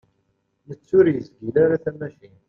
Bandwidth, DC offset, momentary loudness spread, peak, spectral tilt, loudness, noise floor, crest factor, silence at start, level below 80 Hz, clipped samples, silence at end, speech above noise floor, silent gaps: 5.4 kHz; under 0.1%; 21 LU; -4 dBFS; -10 dB/octave; -20 LUFS; -70 dBFS; 18 dB; 0.7 s; -58 dBFS; under 0.1%; 0.4 s; 49 dB; none